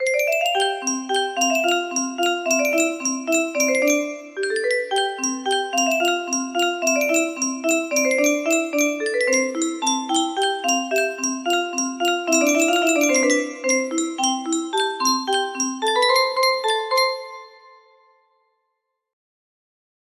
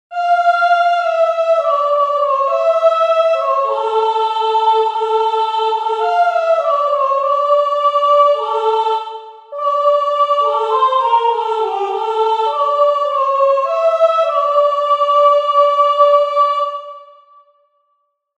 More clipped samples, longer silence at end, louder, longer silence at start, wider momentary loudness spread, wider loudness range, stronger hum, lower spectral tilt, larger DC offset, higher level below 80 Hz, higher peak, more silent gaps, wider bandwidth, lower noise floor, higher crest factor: neither; first, 2.65 s vs 1.35 s; second, -20 LUFS vs -14 LUFS; about the same, 0 s vs 0.1 s; about the same, 6 LU vs 6 LU; about the same, 2 LU vs 2 LU; neither; about the same, 0.5 dB/octave vs 0 dB/octave; neither; first, -72 dBFS vs -86 dBFS; second, -6 dBFS vs 0 dBFS; neither; first, 15.5 kHz vs 8.8 kHz; first, -76 dBFS vs -66 dBFS; about the same, 16 dB vs 14 dB